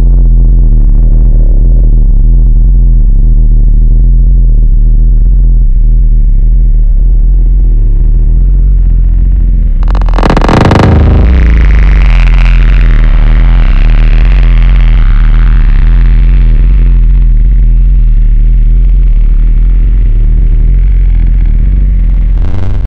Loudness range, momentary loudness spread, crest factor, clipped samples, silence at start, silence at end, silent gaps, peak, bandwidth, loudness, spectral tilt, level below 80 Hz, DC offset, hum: 3 LU; 3 LU; 4 dB; under 0.1%; 0 s; 0 s; none; 0 dBFS; 4.4 kHz; -9 LUFS; -8 dB/octave; -4 dBFS; under 0.1%; none